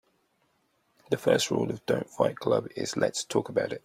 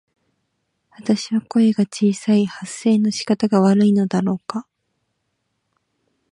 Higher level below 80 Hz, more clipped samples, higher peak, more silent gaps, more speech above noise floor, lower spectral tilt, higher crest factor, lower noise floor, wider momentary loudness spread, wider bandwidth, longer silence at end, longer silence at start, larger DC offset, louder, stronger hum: about the same, -68 dBFS vs -66 dBFS; neither; second, -10 dBFS vs -4 dBFS; neither; second, 44 dB vs 55 dB; second, -4.5 dB/octave vs -6.5 dB/octave; about the same, 20 dB vs 16 dB; about the same, -71 dBFS vs -73 dBFS; second, 6 LU vs 10 LU; first, 16 kHz vs 11 kHz; second, 0.05 s vs 1.7 s; about the same, 1.1 s vs 1 s; neither; second, -28 LUFS vs -18 LUFS; neither